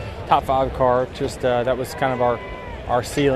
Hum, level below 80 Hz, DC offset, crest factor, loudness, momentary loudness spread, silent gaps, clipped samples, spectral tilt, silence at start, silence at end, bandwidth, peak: none; -38 dBFS; under 0.1%; 18 dB; -21 LUFS; 7 LU; none; under 0.1%; -5.5 dB/octave; 0 s; 0 s; 14.5 kHz; -2 dBFS